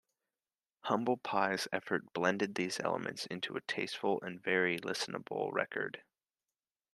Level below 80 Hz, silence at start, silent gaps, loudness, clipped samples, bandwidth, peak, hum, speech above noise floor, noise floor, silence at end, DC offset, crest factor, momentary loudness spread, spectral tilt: -82 dBFS; 0.85 s; none; -36 LUFS; under 0.1%; 13 kHz; -14 dBFS; none; over 54 dB; under -90 dBFS; 0.95 s; under 0.1%; 22 dB; 7 LU; -4 dB/octave